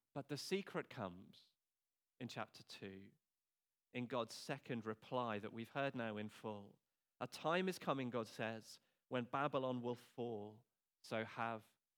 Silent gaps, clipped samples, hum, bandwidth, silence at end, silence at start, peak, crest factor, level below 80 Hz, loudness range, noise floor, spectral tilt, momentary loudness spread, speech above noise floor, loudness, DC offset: none; under 0.1%; none; over 20 kHz; 0.35 s; 0.15 s; -24 dBFS; 22 dB; under -90 dBFS; 8 LU; under -90 dBFS; -5.5 dB/octave; 14 LU; over 44 dB; -46 LUFS; under 0.1%